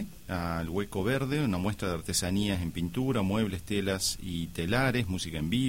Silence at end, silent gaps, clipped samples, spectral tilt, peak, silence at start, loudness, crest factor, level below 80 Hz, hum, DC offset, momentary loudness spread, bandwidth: 0 s; none; under 0.1%; -5 dB/octave; -14 dBFS; 0 s; -31 LUFS; 16 dB; -48 dBFS; none; 0.3%; 6 LU; 16.5 kHz